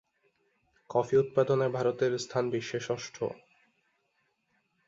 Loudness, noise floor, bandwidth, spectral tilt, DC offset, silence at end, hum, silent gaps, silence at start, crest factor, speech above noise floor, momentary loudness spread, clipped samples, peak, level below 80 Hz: -30 LUFS; -76 dBFS; 7.8 kHz; -5.5 dB/octave; under 0.1%; 1.5 s; none; none; 0.9 s; 18 dB; 47 dB; 10 LU; under 0.1%; -14 dBFS; -72 dBFS